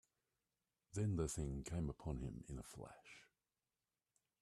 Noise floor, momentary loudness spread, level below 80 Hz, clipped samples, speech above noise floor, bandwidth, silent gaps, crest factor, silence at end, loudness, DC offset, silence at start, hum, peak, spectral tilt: under -90 dBFS; 18 LU; -58 dBFS; under 0.1%; over 45 dB; 13 kHz; none; 20 dB; 1.2 s; -46 LUFS; under 0.1%; 0.95 s; none; -28 dBFS; -6.5 dB/octave